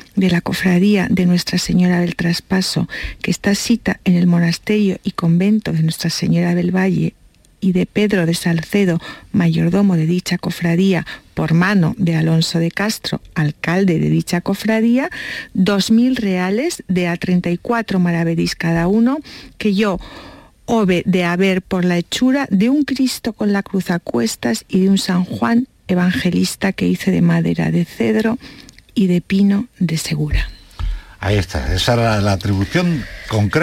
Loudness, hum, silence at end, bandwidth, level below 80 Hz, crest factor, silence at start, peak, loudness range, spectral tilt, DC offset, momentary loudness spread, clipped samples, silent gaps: -17 LUFS; none; 0 s; 16 kHz; -36 dBFS; 12 dB; 0.15 s; -4 dBFS; 2 LU; -6 dB/octave; under 0.1%; 7 LU; under 0.1%; none